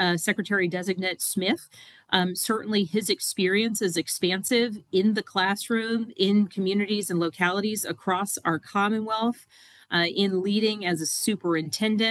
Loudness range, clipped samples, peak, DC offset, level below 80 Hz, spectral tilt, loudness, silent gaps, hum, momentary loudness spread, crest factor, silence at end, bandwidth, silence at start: 2 LU; under 0.1%; -4 dBFS; under 0.1%; -74 dBFS; -3.5 dB/octave; -25 LUFS; none; none; 4 LU; 22 dB; 0 s; 15 kHz; 0 s